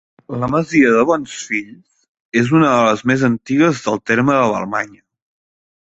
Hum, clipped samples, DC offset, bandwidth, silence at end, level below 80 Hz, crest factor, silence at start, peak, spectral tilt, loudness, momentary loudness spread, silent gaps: none; under 0.1%; under 0.1%; 8.2 kHz; 1.1 s; -52 dBFS; 16 dB; 0.3 s; -2 dBFS; -6 dB/octave; -16 LUFS; 10 LU; 2.08-2.30 s